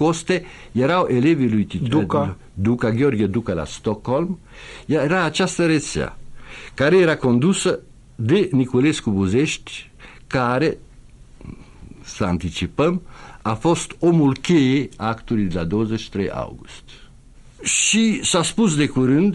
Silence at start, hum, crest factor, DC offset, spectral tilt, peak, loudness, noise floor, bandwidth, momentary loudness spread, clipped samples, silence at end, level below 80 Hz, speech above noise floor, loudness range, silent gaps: 0 s; none; 14 dB; under 0.1%; -5 dB/octave; -6 dBFS; -20 LUFS; -45 dBFS; 11.5 kHz; 13 LU; under 0.1%; 0 s; -44 dBFS; 26 dB; 5 LU; none